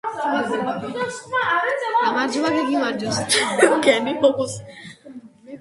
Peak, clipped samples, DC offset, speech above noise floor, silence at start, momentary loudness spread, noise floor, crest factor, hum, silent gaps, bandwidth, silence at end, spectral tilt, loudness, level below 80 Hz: 0 dBFS; under 0.1%; under 0.1%; 21 dB; 0.05 s; 12 LU; -42 dBFS; 20 dB; none; none; 11.5 kHz; 0 s; -3 dB/octave; -20 LUFS; -60 dBFS